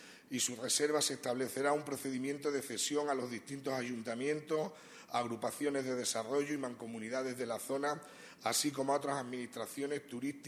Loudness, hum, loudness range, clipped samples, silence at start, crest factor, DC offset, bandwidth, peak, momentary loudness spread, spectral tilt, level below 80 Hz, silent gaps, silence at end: -37 LUFS; none; 3 LU; under 0.1%; 0 s; 18 dB; under 0.1%; 14 kHz; -18 dBFS; 9 LU; -3 dB/octave; -82 dBFS; none; 0 s